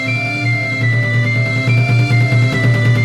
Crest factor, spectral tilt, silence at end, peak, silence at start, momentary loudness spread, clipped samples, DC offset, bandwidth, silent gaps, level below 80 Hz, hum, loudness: 10 dB; -6.5 dB/octave; 0 s; -4 dBFS; 0 s; 3 LU; under 0.1%; under 0.1%; 9.8 kHz; none; -44 dBFS; none; -14 LUFS